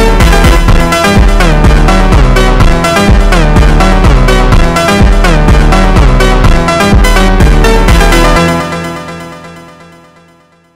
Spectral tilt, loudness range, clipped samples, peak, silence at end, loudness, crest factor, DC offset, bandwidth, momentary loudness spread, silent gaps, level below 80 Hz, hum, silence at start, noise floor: -5.5 dB/octave; 2 LU; 3%; 0 dBFS; 1.15 s; -7 LUFS; 6 dB; under 0.1%; 15 kHz; 3 LU; none; -8 dBFS; none; 0 s; -43 dBFS